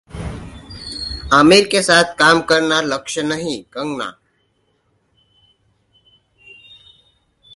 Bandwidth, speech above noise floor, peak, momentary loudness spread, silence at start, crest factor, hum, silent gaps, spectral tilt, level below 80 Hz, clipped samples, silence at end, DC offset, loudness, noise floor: 11.5 kHz; 49 dB; 0 dBFS; 20 LU; 0.15 s; 18 dB; none; none; -3.5 dB/octave; -42 dBFS; under 0.1%; 3.45 s; under 0.1%; -15 LUFS; -63 dBFS